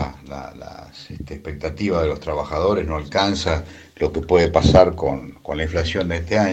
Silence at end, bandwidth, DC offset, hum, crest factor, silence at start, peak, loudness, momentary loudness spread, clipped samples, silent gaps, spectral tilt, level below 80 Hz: 0 s; 8.6 kHz; under 0.1%; none; 20 dB; 0 s; 0 dBFS; -20 LUFS; 21 LU; under 0.1%; none; -6 dB/octave; -36 dBFS